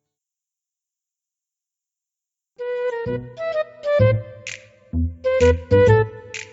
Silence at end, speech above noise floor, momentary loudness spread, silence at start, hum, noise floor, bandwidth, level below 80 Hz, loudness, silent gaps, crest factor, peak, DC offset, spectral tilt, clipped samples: 0.05 s; 71 dB; 17 LU; 2.6 s; none; -88 dBFS; 8 kHz; -36 dBFS; -20 LUFS; none; 20 dB; -2 dBFS; under 0.1%; -7 dB/octave; under 0.1%